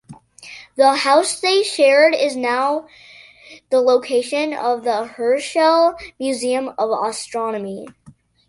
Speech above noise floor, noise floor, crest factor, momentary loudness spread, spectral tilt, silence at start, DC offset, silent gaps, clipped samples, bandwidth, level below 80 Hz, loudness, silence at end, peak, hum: 23 dB; -41 dBFS; 16 dB; 12 LU; -2.5 dB/octave; 0.1 s; under 0.1%; none; under 0.1%; 11.5 kHz; -62 dBFS; -17 LUFS; 0.4 s; -2 dBFS; none